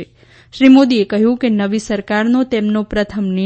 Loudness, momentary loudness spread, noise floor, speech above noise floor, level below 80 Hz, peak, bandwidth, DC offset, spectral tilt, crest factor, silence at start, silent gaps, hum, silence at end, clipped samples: -14 LUFS; 9 LU; -37 dBFS; 24 dB; -42 dBFS; 0 dBFS; 8.6 kHz; under 0.1%; -6 dB/octave; 14 dB; 0 s; none; none; 0 s; under 0.1%